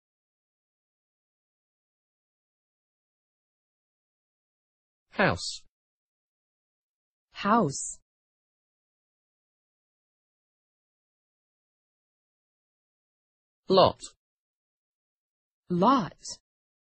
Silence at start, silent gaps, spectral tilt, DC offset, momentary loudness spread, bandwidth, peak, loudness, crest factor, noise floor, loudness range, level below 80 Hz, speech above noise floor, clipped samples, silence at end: 5.15 s; 5.69-7.28 s, 8.02-13.63 s, 14.17-15.63 s; -4.5 dB/octave; under 0.1%; 21 LU; 8.4 kHz; -6 dBFS; -26 LUFS; 28 dB; under -90 dBFS; 6 LU; -66 dBFS; over 65 dB; under 0.1%; 0.5 s